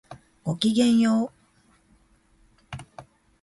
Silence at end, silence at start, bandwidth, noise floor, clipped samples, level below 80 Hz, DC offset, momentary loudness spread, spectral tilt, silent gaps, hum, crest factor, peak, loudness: 0.4 s; 0.1 s; 11.5 kHz; -61 dBFS; under 0.1%; -60 dBFS; under 0.1%; 22 LU; -5.5 dB/octave; none; none; 18 dB; -8 dBFS; -23 LUFS